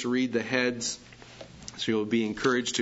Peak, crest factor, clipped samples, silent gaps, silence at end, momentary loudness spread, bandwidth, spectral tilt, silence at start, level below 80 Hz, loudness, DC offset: -10 dBFS; 20 dB; under 0.1%; none; 0 s; 19 LU; 8 kHz; -3.5 dB/octave; 0 s; -60 dBFS; -28 LUFS; under 0.1%